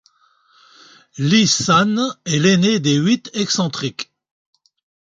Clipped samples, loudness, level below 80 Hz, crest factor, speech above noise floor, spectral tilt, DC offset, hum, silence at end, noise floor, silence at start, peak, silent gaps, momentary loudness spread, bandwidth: under 0.1%; -16 LUFS; -58 dBFS; 18 dB; 41 dB; -4 dB/octave; under 0.1%; none; 1.1 s; -57 dBFS; 1.15 s; -2 dBFS; none; 11 LU; 9.2 kHz